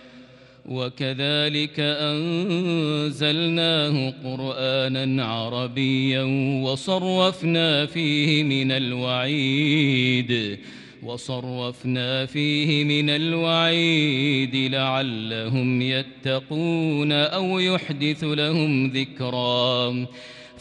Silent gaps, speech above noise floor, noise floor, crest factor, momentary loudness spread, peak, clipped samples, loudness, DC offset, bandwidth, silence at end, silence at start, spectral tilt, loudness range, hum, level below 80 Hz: none; 25 dB; -48 dBFS; 16 dB; 9 LU; -6 dBFS; under 0.1%; -22 LUFS; under 0.1%; 10.5 kHz; 0 s; 0.05 s; -6 dB/octave; 3 LU; none; -66 dBFS